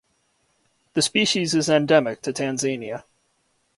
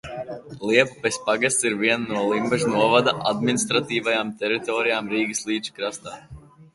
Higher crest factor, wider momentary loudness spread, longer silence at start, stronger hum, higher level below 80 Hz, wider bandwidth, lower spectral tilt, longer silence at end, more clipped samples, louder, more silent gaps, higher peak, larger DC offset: about the same, 18 dB vs 20 dB; about the same, 12 LU vs 12 LU; first, 0.95 s vs 0.05 s; neither; second, -64 dBFS vs -58 dBFS; about the same, 11.5 kHz vs 11.5 kHz; about the same, -3.5 dB/octave vs -3.5 dB/octave; first, 0.75 s vs 0.1 s; neither; about the same, -21 LUFS vs -22 LUFS; neither; second, -6 dBFS vs -2 dBFS; neither